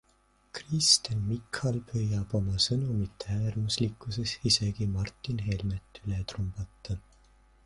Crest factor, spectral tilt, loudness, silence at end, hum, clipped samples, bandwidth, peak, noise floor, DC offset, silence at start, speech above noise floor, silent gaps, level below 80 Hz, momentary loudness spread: 22 dB; -4 dB/octave; -30 LUFS; 0.65 s; none; under 0.1%; 11.5 kHz; -8 dBFS; -67 dBFS; under 0.1%; 0.55 s; 36 dB; none; -48 dBFS; 14 LU